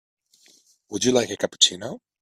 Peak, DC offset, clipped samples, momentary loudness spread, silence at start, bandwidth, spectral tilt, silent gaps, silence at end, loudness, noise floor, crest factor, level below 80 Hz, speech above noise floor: 0 dBFS; under 0.1%; under 0.1%; 17 LU; 0.9 s; 14.5 kHz; -2 dB/octave; none; 0.25 s; -21 LUFS; -58 dBFS; 26 dB; -64 dBFS; 35 dB